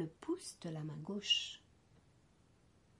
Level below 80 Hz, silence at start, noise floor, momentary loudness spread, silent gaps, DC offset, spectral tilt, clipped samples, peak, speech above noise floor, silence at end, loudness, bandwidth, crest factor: -76 dBFS; 0 s; -70 dBFS; 12 LU; none; under 0.1%; -3.5 dB/octave; under 0.1%; -22 dBFS; 29 dB; 1.4 s; -39 LUFS; 11.5 kHz; 22 dB